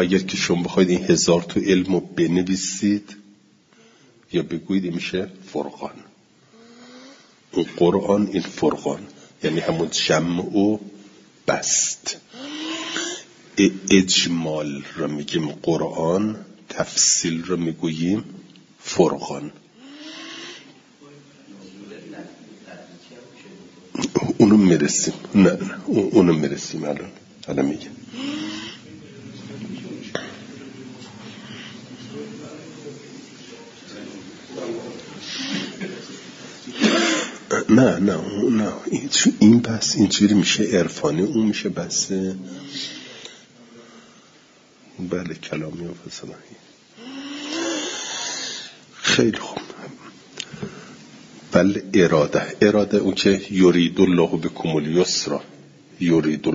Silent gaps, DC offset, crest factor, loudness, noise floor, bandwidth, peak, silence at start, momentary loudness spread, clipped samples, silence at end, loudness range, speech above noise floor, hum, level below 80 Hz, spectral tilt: none; under 0.1%; 22 dB; -20 LUFS; -55 dBFS; 7.8 kHz; 0 dBFS; 0 s; 22 LU; under 0.1%; 0 s; 17 LU; 35 dB; none; -58 dBFS; -4 dB/octave